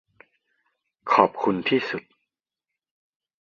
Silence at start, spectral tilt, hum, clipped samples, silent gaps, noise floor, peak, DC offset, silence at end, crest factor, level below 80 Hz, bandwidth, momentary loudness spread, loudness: 1.05 s; -6.5 dB/octave; none; under 0.1%; none; -87 dBFS; -2 dBFS; under 0.1%; 1.4 s; 26 dB; -68 dBFS; 7.2 kHz; 14 LU; -23 LUFS